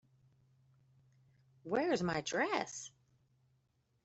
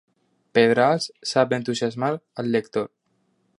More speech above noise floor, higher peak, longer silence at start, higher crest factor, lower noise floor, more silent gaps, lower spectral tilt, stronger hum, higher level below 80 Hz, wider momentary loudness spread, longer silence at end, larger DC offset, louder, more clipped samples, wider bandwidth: second, 41 dB vs 47 dB; second, -18 dBFS vs -4 dBFS; first, 1.65 s vs 0.55 s; about the same, 24 dB vs 20 dB; first, -77 dBFS vs -68 dBFS; neither; about the same, -4 dB/octave vs -5 dB/octave; neither; about the same, -74 dBFS vs -70 dBFS; first, 16 LU vs 11 LU; first, 1.15 s vs 0.75 s; neither; second, -36 LUFS vs -22 LUFS; neither; second, 8.2 kHz vs 11.5 kHz